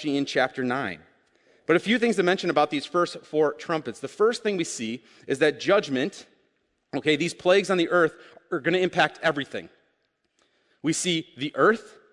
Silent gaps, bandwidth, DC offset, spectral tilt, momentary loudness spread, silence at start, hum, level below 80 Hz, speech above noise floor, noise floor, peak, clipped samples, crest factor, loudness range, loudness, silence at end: none; 11.5 kHz; under 0.1%; -4 dB/octave; 11 LU; 0 s; none; -72 dBFS; 48 dB; -73 dBFS; -6 dBFS; under 0.1%; 20 dB; 3 LU; -25 LUFS; 0.25 s